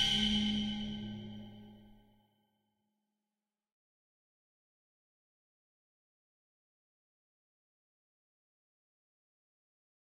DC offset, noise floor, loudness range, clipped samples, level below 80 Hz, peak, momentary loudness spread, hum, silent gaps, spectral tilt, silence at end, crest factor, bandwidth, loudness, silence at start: under 0.1%; under -90 dBFS; 21 LU; under 0.1%; -60 dBFS; -20 dBFS; 22 LU; none; none; -3.5 dB/octave; 8.2 s; 24 dB; 13.5 kHz; -34 LUFS; 0 s